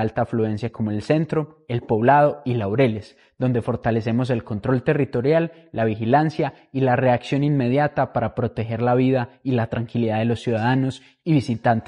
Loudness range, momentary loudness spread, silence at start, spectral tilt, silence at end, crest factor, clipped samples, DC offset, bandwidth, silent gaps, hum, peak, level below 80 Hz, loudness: 1 LU; 7 LU; 0 s; -8.5 dB/octave; 0.05 s; 18 dB; under 0.1%; under 0.1%; 10 kHz; none; none; -4 dBFS; -52 dBFS; -21 LUFS